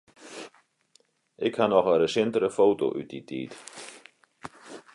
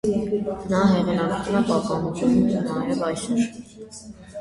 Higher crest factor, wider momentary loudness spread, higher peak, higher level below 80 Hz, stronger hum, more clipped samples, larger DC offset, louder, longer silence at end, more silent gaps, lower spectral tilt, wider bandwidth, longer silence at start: about the same, 20 dB vs 18 dB; first, 23 LU vs 20 LU; about the same, -8 dBFS vs -6 dBFS; second, -70 dBFS vs -48 dBFS; neither; neither; neither; about the same, -25 LUFS vs -23 LUFS; first, 0.15 s vs 0 s; neither; second, -5 dB/octave vs -6.5 dB/octave; about the same, 11.5 kHz vs 11.5 kHz; first, 0.2 s vs 0.05 s